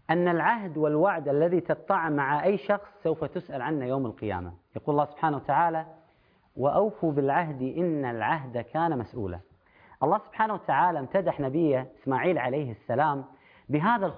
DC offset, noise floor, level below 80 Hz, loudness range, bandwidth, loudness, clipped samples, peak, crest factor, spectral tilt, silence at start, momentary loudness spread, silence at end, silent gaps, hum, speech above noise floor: under 0.1%; -64 dBFS; -62 dBFS; 3 LU; 5.2 kHz; -27 LUFS; under 0.1%; -10 dBFS; 18 dB; -11 dB/octave; 0.1 s; 9 LU; 0 s; none; none; 37 dB